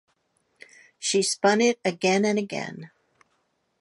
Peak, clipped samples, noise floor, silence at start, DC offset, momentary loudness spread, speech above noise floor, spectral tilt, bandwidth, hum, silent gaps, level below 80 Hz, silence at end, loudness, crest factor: -8 dBFS; under 0.1%; -72 dBFS; 1 s; under 0.1%; 13 LU; 49 dB; -3.5 dB/octave; 11.5 kHz; none; none; -76 dBFS; 0.95 s; -23 LUFS; 20 dB